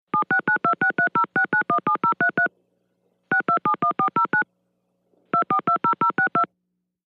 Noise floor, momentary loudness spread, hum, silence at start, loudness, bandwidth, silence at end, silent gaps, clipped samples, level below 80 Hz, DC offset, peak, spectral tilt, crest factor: -77 dBFS; 4 LU; 60 Hz at -70 dBFS; 0.15 s; -21 LUFS; 4.7 kHz; 0.6 s; none; under 0.1%; -76 dBFS; under 0.1%; -8 dBFS; -7.5 dB/octave; 14 dB